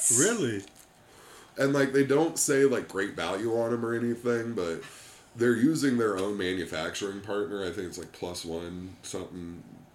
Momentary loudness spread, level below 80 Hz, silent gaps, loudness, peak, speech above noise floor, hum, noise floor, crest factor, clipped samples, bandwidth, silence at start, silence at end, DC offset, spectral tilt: 16 LU; -64 dBFS; none; -28 LUFS; -10 dBFS; 26 dB; none; -54 dBFS; 18 dB; under 0.1%; 16.5 kHz; 0 s; 0.1 s; under 0.1%; -4 dB/octave